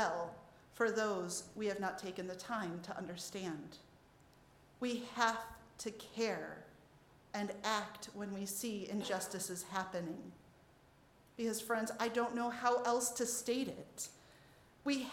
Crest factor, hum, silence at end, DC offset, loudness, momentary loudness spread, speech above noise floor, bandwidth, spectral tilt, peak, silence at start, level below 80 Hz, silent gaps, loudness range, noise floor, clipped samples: 22 dB; none; 0 s; under 0.1%; -40 LUFS; 12 LU; 26 dB; 17 kHz; -3 dB/octave; -18 dBFS; 0 s; -74 dBFS; none; 5 LU; -66 dBFS; under 0.1%